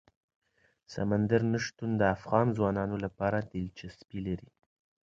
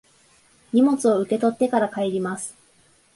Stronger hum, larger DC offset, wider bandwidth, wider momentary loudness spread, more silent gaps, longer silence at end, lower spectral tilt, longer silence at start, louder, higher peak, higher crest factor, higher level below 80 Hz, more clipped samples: neither; neither; second, 7.6 kHz vs 11.5 kHz; first, 13 LU vs 10 LU; neither; about the same, 0.6 s vs 0.65 s; first, -7 dB/octave vs -5.5 dB/octave; first, 0.9 s vs 0.75 s; second, -31 LUFS vs -22 LUFS; second, -10 dBFS vs -6 dBFS; first, 22 dB vs 16 dB; first, -56 dBFS vs -66 dBFS; neither